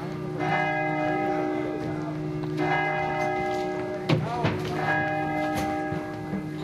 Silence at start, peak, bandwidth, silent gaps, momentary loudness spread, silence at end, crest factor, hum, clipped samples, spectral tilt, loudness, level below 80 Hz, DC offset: 0 s; -8 dBFS; 15.5 kHz; none; 6 LU; 0 s; 18 dB; none; under 0.1%; -6.5 dB/octave; -27 LUFS; -52 dBFS; under 0.1%